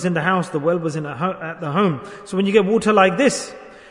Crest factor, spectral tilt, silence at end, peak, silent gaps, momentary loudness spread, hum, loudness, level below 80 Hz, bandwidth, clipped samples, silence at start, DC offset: 18 dB; -5.5 dB/octave; 0.1 s; -2 dBFS; none; 12 LU; none; -19 LUFS; -58 dBFS; 11 kHz; under 0.1%; 0 s; under 0.1%